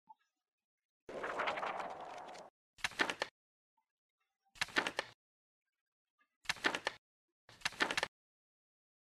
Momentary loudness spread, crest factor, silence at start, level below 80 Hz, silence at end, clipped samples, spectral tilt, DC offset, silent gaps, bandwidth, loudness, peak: 15 LU; 26 dB; 1.1 s; -76 dBFS; 1.05 s; under 0.1%; -1.5 dB/octave; under 0.1%; 2.50-2.77 s, 3.31-3.77 s, 3.91-4.18 s, 5.14-5.66 s, 5.81-6.18 s, 6.36-6.41 s, 6.98-7.48 s; 13 kHz; -39 LUFS; -18 dBFS